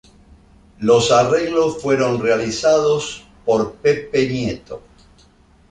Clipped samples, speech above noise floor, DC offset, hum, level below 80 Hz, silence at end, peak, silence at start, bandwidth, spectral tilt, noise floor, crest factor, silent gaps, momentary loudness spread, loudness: under 0.1%; 35 dB; under 0.1%; none; -48 dBFS; 0.9 s; -2 dBFS; 0.8 s; 9.8 kHz; -4.5 dB/octave; -51 dBFS; 16 dB; none; 12 LU; -17 LUFS